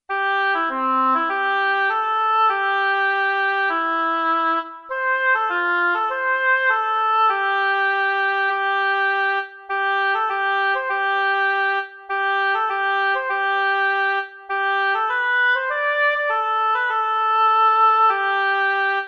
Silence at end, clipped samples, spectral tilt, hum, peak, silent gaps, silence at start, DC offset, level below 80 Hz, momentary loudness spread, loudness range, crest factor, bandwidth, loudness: 0 s; under 0.1%; -1.5 dB/octave; none; -8 dBFS; none; 0.1 s; under 0.1%; -72 dBFS; 4 LU; 2 LU; 12 dB; 6.6 kHz; -19 LUFS